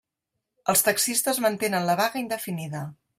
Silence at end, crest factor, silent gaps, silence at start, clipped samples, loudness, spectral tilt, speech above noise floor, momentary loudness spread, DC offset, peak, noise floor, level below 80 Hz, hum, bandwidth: 0.25 s; 22 dB; none; 0.65 s; under 0.1%; -24 LUFS; -3 dB/octave; 58 dB; 11 LU; under 0.1%; -6 dBFS; -83 dBFS; -68 dBFS; none; 16 kHz